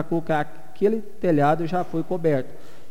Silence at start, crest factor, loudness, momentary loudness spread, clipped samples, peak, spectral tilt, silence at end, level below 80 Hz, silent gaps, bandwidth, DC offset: 0 s; 16 dB; -24 LUFS; 7 LU; under 0.1%; -8 dBFS; -8 dB/octave; 0.35 s; -58 dBFS; none; 16 kHz; 4%